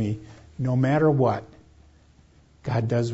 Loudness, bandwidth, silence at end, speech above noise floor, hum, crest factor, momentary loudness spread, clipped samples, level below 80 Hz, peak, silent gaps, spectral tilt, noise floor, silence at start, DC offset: -24 LUFS; 8 kHz; 0 s; 33 dB; none; 16 dB; 16 LU; under 0.1%; -56 dBFS; -8 dBFS; none; -8.5 dB/octave; -56 dBFS; 0 s; under 0.1%